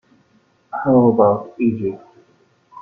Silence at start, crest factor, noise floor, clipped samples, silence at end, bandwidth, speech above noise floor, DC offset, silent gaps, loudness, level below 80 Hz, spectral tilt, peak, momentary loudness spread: 0.75 s; 16 dB; -58 dBFS; under 0.1%; 0 s; 2.8 kHz; 42 dB; under 0.1%; none; -17 LUFS; -56 dBFS; -12 dB/octave; -2 dBFS; 15 LU